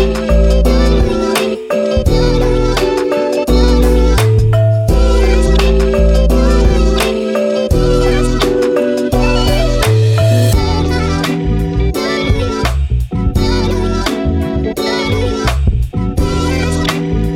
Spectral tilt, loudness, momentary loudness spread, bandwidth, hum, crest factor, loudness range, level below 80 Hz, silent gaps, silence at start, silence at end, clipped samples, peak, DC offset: -6 dB/octave; -13 LUFS; 5 LU; 15.5 kHz; none; 10 dB; 4 LU; -16 dBFS; none; 0 s; 0 s; under 0.1%; 0 dBFS; under 0.1%